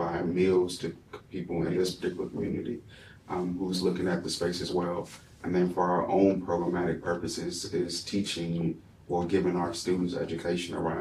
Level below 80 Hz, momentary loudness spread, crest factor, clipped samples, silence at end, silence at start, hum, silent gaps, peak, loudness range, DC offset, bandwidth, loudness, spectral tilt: -56 dBFS; 11 LU; 18 dB; under 0.1%; 0 s; 0 s; none; none; -12 dBFS; 3 LU; under 0.1%; 13.5 kHz; -30 LUFS; -5.5 dB/octave